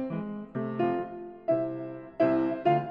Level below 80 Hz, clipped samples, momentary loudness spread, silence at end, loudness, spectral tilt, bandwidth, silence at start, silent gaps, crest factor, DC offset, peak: -66 dBFS; under 0.1%; 12 LU; 0 s; -30 LUFS; -10 dB/octave; 5 kHz; 0 s; none; 18 dB; under 0.1%; -12 dBFS